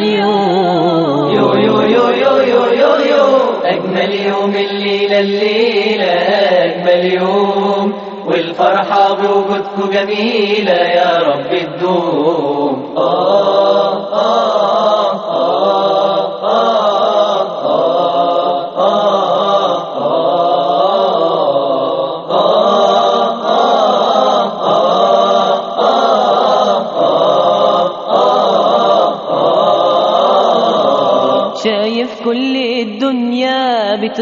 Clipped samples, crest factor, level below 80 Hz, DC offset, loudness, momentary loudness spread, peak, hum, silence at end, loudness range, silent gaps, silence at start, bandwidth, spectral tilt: under 0.1%; 12 dB; -62 dBFS; under 0.1%; -12 LUFS; 5 LU; 0 dBFS; none; 0 s; 2 LU; none; 0 s; 7.2 kHz; -3 dB/octave